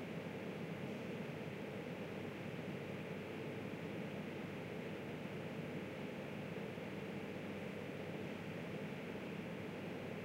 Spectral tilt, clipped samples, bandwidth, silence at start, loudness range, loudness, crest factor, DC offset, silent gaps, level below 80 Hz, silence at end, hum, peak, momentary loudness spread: -6.5 dB/octave; under 0.1%; 16 kHz; 0 s; 0 LU; -47 LUFS; 14 dB; under 0.1%; none; -76 dBFS; 0 s; none; -34 dBFS; 1 LU